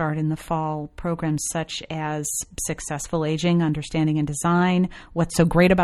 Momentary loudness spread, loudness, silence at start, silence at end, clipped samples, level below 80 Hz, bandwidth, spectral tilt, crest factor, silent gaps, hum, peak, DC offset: 9 LU; -23 LUFS; 0 s; 0 s; under 0.1%; -42 dBFS; 14 kHz; -5.5 dB/octave; 18 dB; none; none; -4 dBFS; under 0.1%